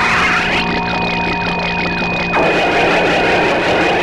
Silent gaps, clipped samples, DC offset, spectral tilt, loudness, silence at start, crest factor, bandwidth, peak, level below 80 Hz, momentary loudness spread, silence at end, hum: none; under 0.1%; 0.1%; -4.5 dB/octave; -14 LUFS; 0 s; 12 dB; 13 kHz; -2 dBFS; -34 dBFS; 4 LU; 0 s; none